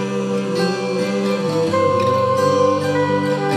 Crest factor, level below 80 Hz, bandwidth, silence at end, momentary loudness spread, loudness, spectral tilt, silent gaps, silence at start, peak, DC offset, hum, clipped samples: 14 dB; -62 dBFS; 13.5 kHz; 0 s; 5 LU; -18 LUFS; -6 dB/octave; none; 0 s; -4 dBFS; under 0.1%; none; under 0.1%